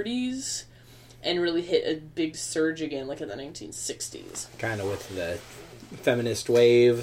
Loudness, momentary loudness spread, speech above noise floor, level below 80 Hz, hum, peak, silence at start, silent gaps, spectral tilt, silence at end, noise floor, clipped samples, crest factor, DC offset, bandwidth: -27 LUFS; 16 LU; 24 dB; -58 dBFS; none; -8 dBFS; 0 s; none; -4.5 dB/octave; 0 s; -51 dBFS; under 0.1%; 18 dB; under 0.1%; 16 kHz